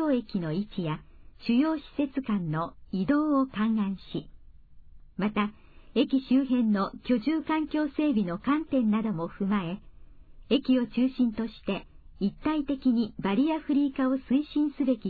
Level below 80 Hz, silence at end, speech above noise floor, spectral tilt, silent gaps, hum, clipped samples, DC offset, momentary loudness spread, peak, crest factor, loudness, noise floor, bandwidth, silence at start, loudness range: -54 dBFS; 0 s; 22 dB; -10 dB/octave; none; none; under 0.1%; under 0.1%; 9 LU; -12 dBFS; 16 dB; -28 LUFS; -49 dBFS; 4.8 kHz; 0 s; 3 LU